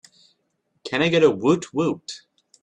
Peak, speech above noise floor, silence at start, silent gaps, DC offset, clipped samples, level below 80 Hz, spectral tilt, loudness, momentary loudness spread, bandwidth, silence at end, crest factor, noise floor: -4 dBFS; 51 dB; 0.85 s; none; under 0.1%; under 0.1%; -62 dBFS; -5.5 dB/octave; -21 LUFS; 20 LU; 9.8 kHz; 0.45 s; 18 dB; -72 dBFS